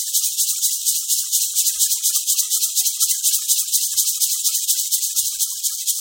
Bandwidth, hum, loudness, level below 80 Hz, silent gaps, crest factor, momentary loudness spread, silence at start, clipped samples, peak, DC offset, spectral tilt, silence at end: 17 kHz; none; -17 LUFS; -78 dBFS; none; 18 dB; 3 LU; 0 s; under 0.1%; -2 dBFS; under 0.1%; 9.5 dB/octave; 0 s